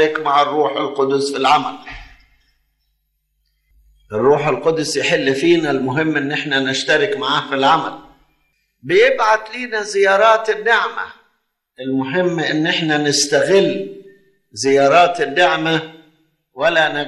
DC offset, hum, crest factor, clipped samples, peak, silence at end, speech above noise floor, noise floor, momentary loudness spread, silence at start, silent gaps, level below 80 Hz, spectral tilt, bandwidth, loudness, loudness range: under 0.1%; none; 16 dB; under 0.1%; -2 dBFS; 0 s; 52 dB; -68 dBFS; 13 LU; 0 s; none; -54 dBFS; -3.5 dB/octave; 12.5 kHz; -16 LUFS; 5 LU